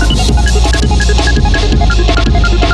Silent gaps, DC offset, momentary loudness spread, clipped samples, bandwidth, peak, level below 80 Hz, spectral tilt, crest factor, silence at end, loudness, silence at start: none; under 0.1%; 1 LU; under 0.1%; 11.5 kHz; 0 dBFS; -10 dBFS; -5 dB/octave; 8 dB; 0 s; -11 LUFS; 0 s